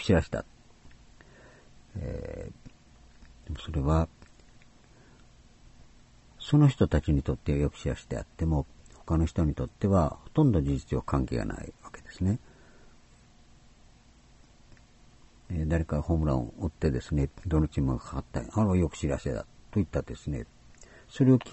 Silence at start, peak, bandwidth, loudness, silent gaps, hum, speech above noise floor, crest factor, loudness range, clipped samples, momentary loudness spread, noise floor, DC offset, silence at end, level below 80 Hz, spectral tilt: 0 s; -8 dBFS; 8.2 kHz; -29 LUFS; none; none; 29 dB; 20 dB; 10 LU; under 0.1%; 16 LU; -57 dBFS; under 0.1%; 0 s; -40 dBFS; -8 dB/octave